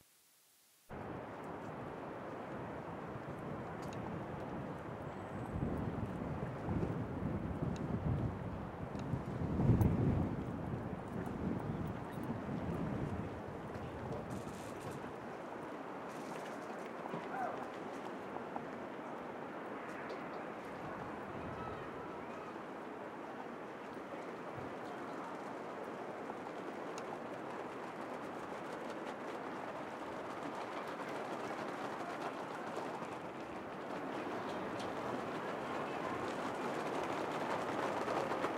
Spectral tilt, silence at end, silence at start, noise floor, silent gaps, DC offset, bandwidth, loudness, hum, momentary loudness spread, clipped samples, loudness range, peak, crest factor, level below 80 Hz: -7 dB/octave; 0 s; 0.9 s; -69 dBFS; none; under 0.1%; 16 kHz; -43 LUFS; none; 8 LU; under 0.1%; 8 LU; -18 dBFS; 24 dB; -58 dBFS